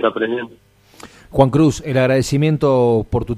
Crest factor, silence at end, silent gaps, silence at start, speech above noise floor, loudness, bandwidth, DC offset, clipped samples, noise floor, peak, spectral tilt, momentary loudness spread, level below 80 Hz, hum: 16 dB; 0 s; none; 0 s; 27 dB; -16 LUFS; 14.5 kHz; under 0.1%; under 0.1%; -43 dBFS; 0 dBFS; -7 dB/octave; 10 LU; -38 dBFS; none